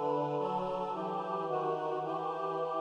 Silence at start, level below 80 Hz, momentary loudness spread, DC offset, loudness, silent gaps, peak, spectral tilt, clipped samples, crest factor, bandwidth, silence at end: 0 s; -70 dBFS; 3 LU; under 0.1%; -35 LUFS; none; -22 dBFS; -7.5 dB/octave; under 0.1%; 12 dB; 9.6 kHz; 0 s